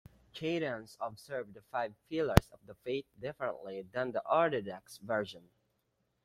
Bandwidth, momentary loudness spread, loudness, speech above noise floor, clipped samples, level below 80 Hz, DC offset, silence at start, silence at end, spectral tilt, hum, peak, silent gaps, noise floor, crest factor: 16.5 kHz; 15 LU; -36 LUFS; 44 dB; under 0.1%; -50 dBFS; under 0.1%; 0.35 s; 0.85 s; -6 dB/octave; none; -4 dBFS; none; -79 dBFS; 32 dB